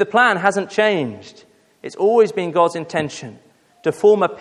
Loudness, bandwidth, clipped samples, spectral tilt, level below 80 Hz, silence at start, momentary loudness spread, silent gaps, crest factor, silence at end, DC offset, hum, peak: -17 LUFS; 11.5 kHz; under 0.1%; -5 dB/octave; -64 dBFS; 0 s; 20 LU; none; 18 dB; 0 s; under 0.1%; none; 0 dBFS